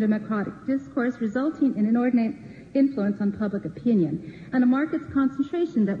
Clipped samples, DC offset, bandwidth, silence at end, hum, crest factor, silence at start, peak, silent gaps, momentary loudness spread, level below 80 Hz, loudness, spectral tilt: under 0.1%; under 0.1%; 7.2 kHz; 0 s; none; 12 dB; 0 s; -12 dBFS; none; 7 LU; -60 dBFS; -25 LUFS; -9 dB/octave